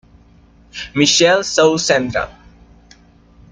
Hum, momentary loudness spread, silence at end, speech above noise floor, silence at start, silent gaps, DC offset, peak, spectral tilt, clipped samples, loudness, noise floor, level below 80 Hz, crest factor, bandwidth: none; 18 LU; 1.2 s; 33 dB; 0.75 s; none; under 0.1%; -2 dBFS; -3 dB/octave; under 0.1%; -14 LUFS; -48 dBFS; -46 dBFS; 16 dB; 9.6 kHz